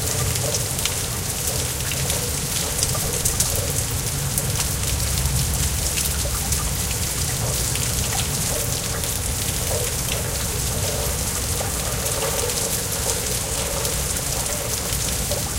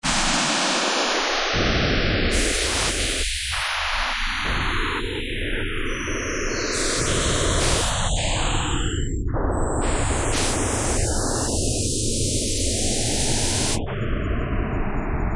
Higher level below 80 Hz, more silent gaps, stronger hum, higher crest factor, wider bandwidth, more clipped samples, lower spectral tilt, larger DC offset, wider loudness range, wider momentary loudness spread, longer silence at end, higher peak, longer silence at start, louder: about the same, -32 dBFS vs -28 dBFS; neither; neither; first, 24 dB vs 16 dB; first, 17 kHz vs 11.5 kHz; neither; about the same, -2.5 dB/octave vs -3 dB/octave; second, under 0.1% vs 0.3%; about the same, 1 LU vs 3 LU; second, 2 LU vs 6 LU; about the same, 0 s vs 0 s; first, 0 dBFS vs -6 dBFS; about the same, 0 s vs 0.05 s; about the same, -22 LUFS vs -22 LUFS